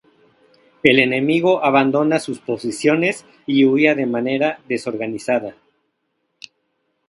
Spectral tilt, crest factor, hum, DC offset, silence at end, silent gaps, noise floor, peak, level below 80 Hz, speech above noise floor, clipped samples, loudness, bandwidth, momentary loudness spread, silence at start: -5.5 dB/octave; 18 dB; none; under 0.1%; 1.55 s; none; -71 dBFS; 0 dBFS; -64 dBFS; 54 dB; under 0.1%; -18 LUFS; 11.5 kHz; 11 LU; 0.85 s